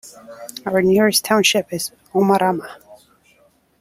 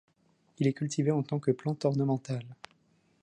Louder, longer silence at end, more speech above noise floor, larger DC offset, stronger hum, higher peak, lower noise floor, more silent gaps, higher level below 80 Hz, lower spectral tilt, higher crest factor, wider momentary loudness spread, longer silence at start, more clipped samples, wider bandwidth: first, -17 LUFS vs -31 LUFS; first, 0.85 s vs 0.7 s; about the same, 39 dB vs 39 dB; neither; neither; first, -2 dBFS vs -14 dBFS; second, -57 dBFS vs -69 dBFS; neither; first, -60 dBFS vs -74 dBFS; second, -3.5 dB/octave vs -7 dB/octave; about the same, 18 dB vs 18 dB; first, 20 LU vs 9 LU; second, 0.05 s vs 0.6 s; neither; first, 16.5 kHz vs 9.8 kHz